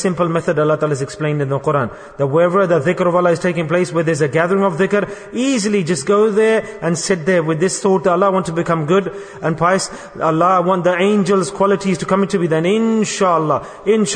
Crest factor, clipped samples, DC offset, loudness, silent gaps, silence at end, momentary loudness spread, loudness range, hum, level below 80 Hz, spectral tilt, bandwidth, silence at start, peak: 14 dB; under 0.1%; under 0.1%; -16 LUFS; none; 0 s; 6 LU; 1 LU; none; -52 dBFS; -5.5 dB/octave; 9.6 kHz; 0 s; -2 dBFS